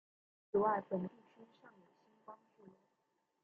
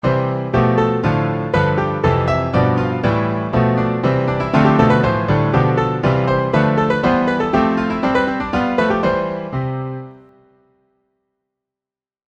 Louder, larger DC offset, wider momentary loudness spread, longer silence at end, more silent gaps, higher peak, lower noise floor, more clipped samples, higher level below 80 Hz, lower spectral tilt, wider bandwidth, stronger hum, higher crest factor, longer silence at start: second, -38 LUFS vs -17 LUFS; neither; first, 24 LU vs 4 LU; second, 1.1 s vs 2.15 s; neither; second, -22 dBFS vs 0 dBFS; second, -83 dBFS vs under -90 dBFS; neither; second, -82 dBFS vs -38 dBFS; about the same, -7.5 dB/octave vs -8.5 dB/octave; second, 4.1 kHz vs 7.6 kHz; neither; first, 22 dB vs 16 dB; first, 0.55 s vs 0.05 s